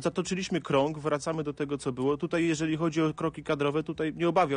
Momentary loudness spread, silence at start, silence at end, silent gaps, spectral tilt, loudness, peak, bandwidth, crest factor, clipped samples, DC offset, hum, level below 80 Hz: 6 LU; 0 s; 0 s; none; -6 dB/octave; -29 LUFS; -12 dBFS; 10 kHz; 16 dB; under 0.1%; under 0.1%; none; -60 dBFS